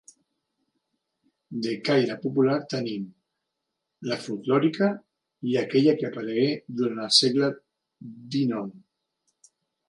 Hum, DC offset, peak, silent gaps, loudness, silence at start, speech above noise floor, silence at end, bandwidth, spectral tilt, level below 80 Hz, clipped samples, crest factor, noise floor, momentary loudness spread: none; under 0.1%; -6 dBFS; none; -25 LUFS; 1.5 s; 58 dB; 1.1 s; 11.5 kHz; -5 dB/octave; -76 dBFS; under 0.1%; 22 dB; -82 dBFS; 18 LU